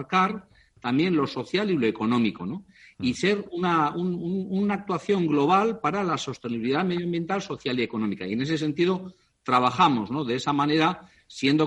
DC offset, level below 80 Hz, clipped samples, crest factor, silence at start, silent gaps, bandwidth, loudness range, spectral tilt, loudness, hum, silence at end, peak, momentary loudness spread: under 0.1%; -64 dBFS; under 0.1%; 18 dB; 0 s; none; 10.5 kHz; 2 LU; -6 dB/octave; -25 LUFS; none; 0 s; -6 dBFS; 9 LU